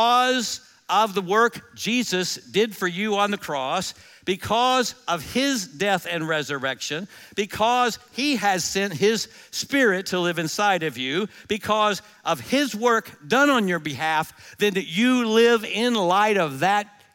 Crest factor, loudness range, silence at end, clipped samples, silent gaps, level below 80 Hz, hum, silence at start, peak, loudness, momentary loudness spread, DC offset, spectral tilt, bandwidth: 16 dB; 3 LU; 0.3 s; under 0.1%; none; -62 dBFS; none; 0 s; -6 dBFS; -22 LUFS; 9 LU; under 0.1%; -3.5 dB/octave; 17 kHz